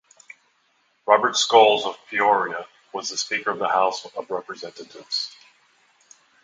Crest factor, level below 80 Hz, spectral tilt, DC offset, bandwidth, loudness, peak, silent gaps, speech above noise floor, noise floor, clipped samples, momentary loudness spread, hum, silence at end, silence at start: 24 dB; -76 dBFS; -1 dB/octave; under 0.1%; 9.6 kHz; -21 LUFS; 0 dBFS; none; 44 dB; -66 dBFS; under 0.1%; 19 LU; none; 1.15 s; 1.05 s